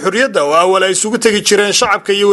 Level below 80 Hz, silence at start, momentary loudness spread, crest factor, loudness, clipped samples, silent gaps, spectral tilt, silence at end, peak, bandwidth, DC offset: -52 dBFS; 0 s; 3 LU; 12 dB; -11 LUFS; under 0.1%; none; -2 dB/octave; 0 s; 0 dBFS; 15.5 kHz; under 0.1%